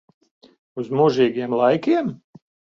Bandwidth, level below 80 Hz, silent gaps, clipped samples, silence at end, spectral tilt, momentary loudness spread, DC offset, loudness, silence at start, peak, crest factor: 7.4 kHz; -66 dBFS; none; under 0.1%; 0.65 s; -7.5 dB/octave; 14 LU; under 0.1%; -20 LUFS; 0.75 s; -6 dBFS; 16 dB